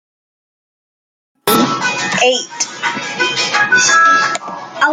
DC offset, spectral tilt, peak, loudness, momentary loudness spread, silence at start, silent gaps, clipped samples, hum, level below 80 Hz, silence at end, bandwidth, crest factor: under 0.1%; -1.5 dB/octave; 0 dBFS; -13 LUFS; 11 LU; 1.45 s; none; under 0.1%; none; -62 dBFS; 0 s; 15.5 kHz; 16 dB